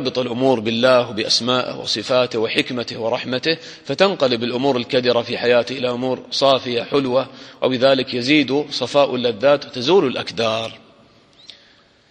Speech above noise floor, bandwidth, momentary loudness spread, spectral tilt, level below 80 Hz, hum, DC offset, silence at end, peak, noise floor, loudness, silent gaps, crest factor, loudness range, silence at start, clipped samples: 34 dB; 10.5 kHz; 7 LU; -4.5 dB/octave; -62 dBFS; none; under 0.1%; 1.35 s; 0 dBFS; -52 dBFS; -18 LUFS; none; 18 dB; 2 LU; 0 s; under 0.1%